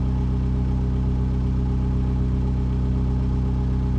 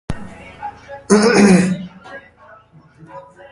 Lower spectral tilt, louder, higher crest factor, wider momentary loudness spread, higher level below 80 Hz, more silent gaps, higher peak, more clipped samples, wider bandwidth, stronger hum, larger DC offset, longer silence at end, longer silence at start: first, -10 dB/octave vs -5.5 dB/octave; second, -24 LUFS vs -13 LUFS; second, 8 dB vs 18 dB; second, 0 LU vs 26 LU; first, -24 dBFS vs -44 dBFS; neither; second, -12 dBFS vs 0 dBFS; neither; second, 5.8 kHz vs 11.5 kHz; neither; neither; second, 0 s vs 0.3 s; about the same, 0 s vs 0.1 s